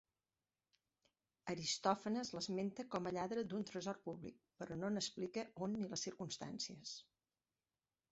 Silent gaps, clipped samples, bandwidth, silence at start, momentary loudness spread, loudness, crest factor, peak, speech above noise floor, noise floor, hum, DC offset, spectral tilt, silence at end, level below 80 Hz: none; under 0.1%; 8 kHz; 1.45 s; 12 LU; -44 LUFS; 24 dB; -22 dBFS; over 46 dB; under -90 dBFS; none; under 0.1%; -4 dB/octave; 1.1 s; -80 dBFS